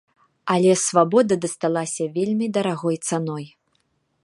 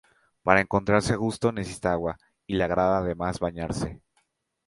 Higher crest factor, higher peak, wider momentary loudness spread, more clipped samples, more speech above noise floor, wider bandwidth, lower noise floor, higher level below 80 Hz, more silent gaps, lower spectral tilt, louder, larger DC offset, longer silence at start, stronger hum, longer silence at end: second, 20 dB vs 26 dB; about the same, -2 dBFS vs 0 dBFS; about the same, 12 LU vs 10 LU; neither; about the same, 48 dB vs 47 dB; about the same, 11.5 kHz vs 11.5 kHz; about the same, -69 dBFS vs -72 dBFS; second, -68 dBFS vs -46 dBFS; neither; about the same, -5 dB/octave vs -6 dB/octave; first, -21 LUFS vs -26 LUFS; neither; about the same, 0.45 s vs 0.45 s; neither; about the same, 0.75 s vs 0.7 s